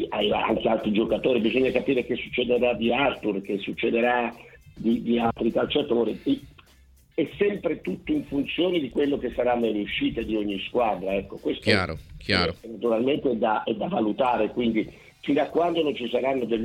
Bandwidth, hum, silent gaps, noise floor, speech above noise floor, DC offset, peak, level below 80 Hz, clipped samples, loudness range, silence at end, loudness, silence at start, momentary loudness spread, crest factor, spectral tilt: 13 kHz; none; none; -56 dBFS; 31 dB; under 0.1%; -4 dBFS; -52 dBFS; under 0.1%; 3 LU; 0 s; -25 LUFS; 0 s; 6 LU; 20 dB; -6.5 dB/octave